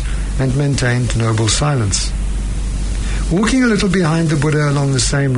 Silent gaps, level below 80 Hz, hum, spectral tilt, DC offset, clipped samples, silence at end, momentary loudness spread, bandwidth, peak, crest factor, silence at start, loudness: none; -22 dBFS; none; -5 dB/octave; under 0.1%; under 0.1%; 0 s; 9 LU; 11 kHz; -2 dBFS; 12 dB; 0 s; -16 LUFS